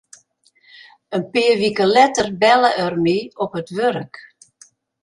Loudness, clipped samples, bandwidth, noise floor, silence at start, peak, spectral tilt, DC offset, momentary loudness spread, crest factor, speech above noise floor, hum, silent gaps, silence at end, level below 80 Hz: -17 LUFS; under 0.1%; 11.5 kHz; -58 dBFS; 1.1 s; -2 dBFS; -4.5 dB/octave; under 0.1%; 12 LU; 18 dB; 41 dB; none; none; 0.85 s; -58 dBFS